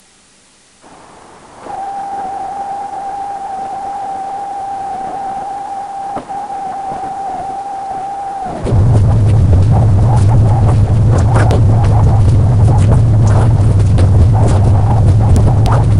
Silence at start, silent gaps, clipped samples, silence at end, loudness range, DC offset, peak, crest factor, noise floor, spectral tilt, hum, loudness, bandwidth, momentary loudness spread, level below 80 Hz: 1.55 s; none; under 0.1%; 0 s; 12 LU; under 0.1%; 0 dBFS; 12 dB; -47 dBFS; -8.5 dB/octave; none; -13 LUFS; 10.5 kHz; 12 LU; -20 dBFS